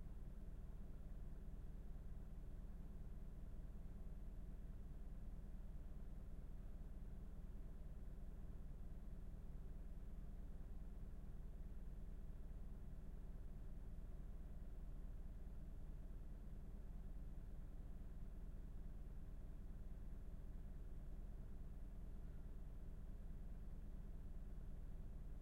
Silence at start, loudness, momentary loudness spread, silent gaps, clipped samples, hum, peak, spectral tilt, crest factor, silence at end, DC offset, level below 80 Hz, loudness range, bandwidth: 0 s; -58 LUFS; 1 LU; none; under 0.1%; none; -42 dBFS; -8 dB/octave; 10 dB; 0 s; under 0.1%; -52 dBFS; 0 LU; 4.3 kHz